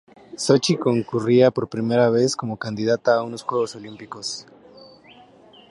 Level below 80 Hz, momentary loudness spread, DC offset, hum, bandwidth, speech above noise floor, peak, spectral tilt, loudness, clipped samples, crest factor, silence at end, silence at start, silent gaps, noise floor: -64 dBFS; 14 LU; under 0.1%; none; 11.5 kHz; 29 dB; -2 dBFS; -5.5 dB/octave; -21 LUFS; under 0.1%; 20 dB; 0.85 s; 0.35 s; none; -49 dBFS